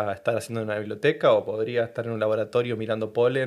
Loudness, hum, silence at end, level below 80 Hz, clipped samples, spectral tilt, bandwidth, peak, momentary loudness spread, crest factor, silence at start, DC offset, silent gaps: -25 LUFS; none; 0 s; -70 dBFS; under 0.1%; -6 dB/octave; 13.5 kHz; -8 dBFS; 8 LU; 16 dB; 0 s; under 0.1%; none